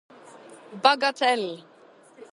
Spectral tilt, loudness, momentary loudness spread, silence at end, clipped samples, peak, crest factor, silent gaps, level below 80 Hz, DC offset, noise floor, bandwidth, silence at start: -2.5 dB/octave; -23 LUFS; 21 LU; 0.1 s; under 0.1%; -2 dBFS; 24 dB; none; -84 dBFS; under 0.1%; -53 dBFS; 11.5 kHz; 0.5 s